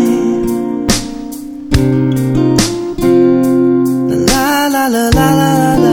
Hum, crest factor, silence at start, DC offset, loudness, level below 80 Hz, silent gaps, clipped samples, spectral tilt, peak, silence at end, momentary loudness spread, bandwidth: none; 12 dB; 0 s; under 0.1%; -12 LUFS; -26 dBFS; none; under 0.1%; -5.5 dB/octave; 0 dBFS; 0 s; 6 LU; 18.5 kHz